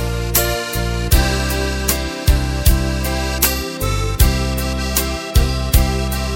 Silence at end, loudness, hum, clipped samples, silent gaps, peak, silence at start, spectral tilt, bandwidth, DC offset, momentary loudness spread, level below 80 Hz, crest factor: 0 s; -18 LUFS; none; under 0.1%; none; 0 dBFS; 0 s; -4 dB/octave; 17 kHz; under 0.1%; 4 LU; -20 dBFS; 16 dB